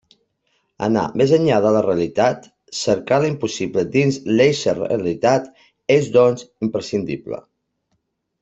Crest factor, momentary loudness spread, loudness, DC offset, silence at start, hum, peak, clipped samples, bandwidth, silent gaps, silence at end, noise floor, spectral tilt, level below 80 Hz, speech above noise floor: 16 dB; 12 LU; -18 LUFS; under 0.1%; 0.8 s; none; -2 dBFS; under 0.1%; 8.2 kHz; none; 1 s; -71 dBFS; -6 dB/octave; -56 dBFS; 53 dB